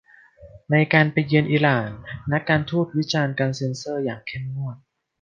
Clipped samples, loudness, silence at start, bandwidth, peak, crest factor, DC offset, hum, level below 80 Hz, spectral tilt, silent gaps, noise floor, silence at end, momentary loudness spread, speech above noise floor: under 0.1%; -22 LUFS; 0.4 s; 7.4 kHz; -2 dBFS; 20 dB; under 0.1%; none; -54 dBFS; -6.5 dB/octave; none; -48 dBFS; 0.45 s; 13 LU; 27 dB